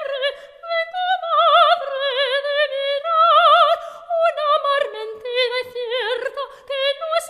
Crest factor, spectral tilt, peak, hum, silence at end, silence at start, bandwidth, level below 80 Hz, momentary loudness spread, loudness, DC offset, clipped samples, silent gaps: 16 dB; 1 dB/octave; -2 dBFS; none; 0 s; 0 s; 14 kHz; -70 dBFS; 12 LU; -18 LUFS; under 0.1%; under 0.1%; none